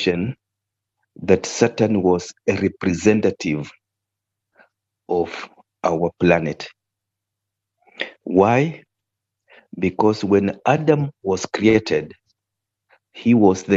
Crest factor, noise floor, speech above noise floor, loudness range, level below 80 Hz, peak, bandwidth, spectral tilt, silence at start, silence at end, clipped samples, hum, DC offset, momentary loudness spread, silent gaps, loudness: 20 dB; -83 dBFS; 64 dB; 4 LU; -54 dBFS; -2 dBFS; 8 kHz; -6 dB/octave; 0 s; 0 s; under 0.1%; none; under 0.1%; 15 LU; none; -19 LUFS